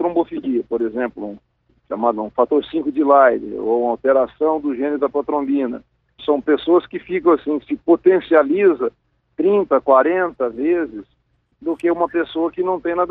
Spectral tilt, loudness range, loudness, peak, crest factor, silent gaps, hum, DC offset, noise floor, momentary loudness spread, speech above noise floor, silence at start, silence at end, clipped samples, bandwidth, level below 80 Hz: -8.5 dB/octave; 3 LU; -18 LUFS; -2 dBFS; 16 dB; none; none; under 0.1%; -64 dBFS; 11 LU; 47 dB; 0 s; 0 s; under 0.1%; 4.1 kHz; -58 dBFS